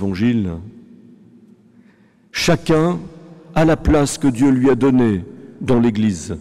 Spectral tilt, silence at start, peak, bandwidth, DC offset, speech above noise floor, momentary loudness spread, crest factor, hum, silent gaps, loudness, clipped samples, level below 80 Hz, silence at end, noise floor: -6 dB/octave; 0 s; -8 dBFS; 14.5 kHz; under 0.1%; 36 dB; 13 LU; 10 dB; none; none; -17 LUFS; under 0.1%; -34 dBFS; 0 s; -52 dBFS